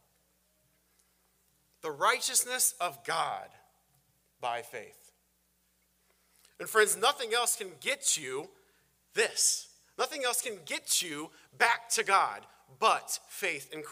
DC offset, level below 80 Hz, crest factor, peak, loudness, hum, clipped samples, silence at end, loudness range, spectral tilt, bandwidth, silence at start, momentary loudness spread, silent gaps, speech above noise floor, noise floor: under 0.1%; -82 dBFS; 24 dB; -8 dBFS; -30 LUFS; none; under 0.1%; 0 s; 9 LU; 0.5 dB/octave; 16 kHz; 1.85 s; 16 LU; none; 41 dB; -73 dBFS